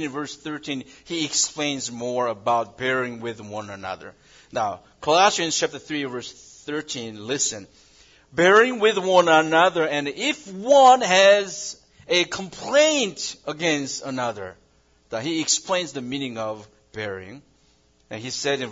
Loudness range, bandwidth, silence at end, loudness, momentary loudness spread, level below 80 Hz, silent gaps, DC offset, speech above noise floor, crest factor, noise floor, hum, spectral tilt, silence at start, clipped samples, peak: 10 LU; 7.8 kHz; 0 s; -21 LUFS; 18 LU; -64 dBFS; none; under 0.1%; 38 dB; 20 dB; -60 dBFS; none; -2.5 dB/octave; 0 s; under 0.1%; -2 dBFS